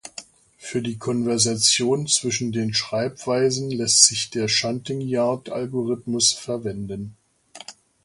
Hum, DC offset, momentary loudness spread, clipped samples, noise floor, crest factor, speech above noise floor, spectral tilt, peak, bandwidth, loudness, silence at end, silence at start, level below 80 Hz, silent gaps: none; under 0.1%; 21 LU; under 0.1%; -46 dBFS; 24 dB; 24 dB; -2.5 dB/octave; 0 dBFS; 11.5 kHz; -21 LUFS; 0.35 s; 0.05 s; -60 dBFS; none